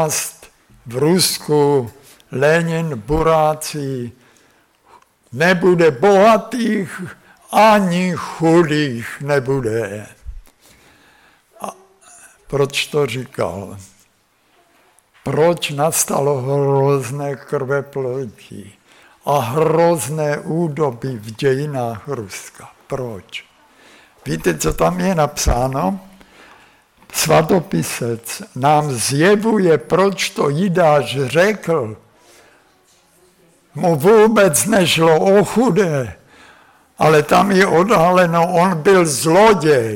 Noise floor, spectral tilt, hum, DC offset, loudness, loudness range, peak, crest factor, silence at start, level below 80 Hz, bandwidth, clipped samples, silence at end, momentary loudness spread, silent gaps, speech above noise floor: -59 dBFS; -5 dB/octave; none; under 0.1%; -16 LUFS; 9 LU; -4 dBFS; 14 dB; 0 s; -40 dBFS; 17.5 kHz; under 0.1%; 0 s; 16 LU; none; 43 dB